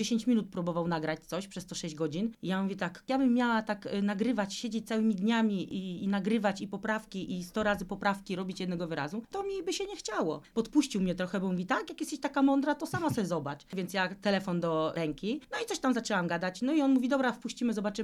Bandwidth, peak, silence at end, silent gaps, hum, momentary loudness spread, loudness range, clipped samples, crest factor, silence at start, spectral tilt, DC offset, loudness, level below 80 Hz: 14 kHz; -14 dBFS; 0 s; none; none; 8 LU; 3 LU; under 0.1%; 16 dB; 0 s; -5.5 dB/octave; under 0.1%; -32 LUFS; -62 dBFS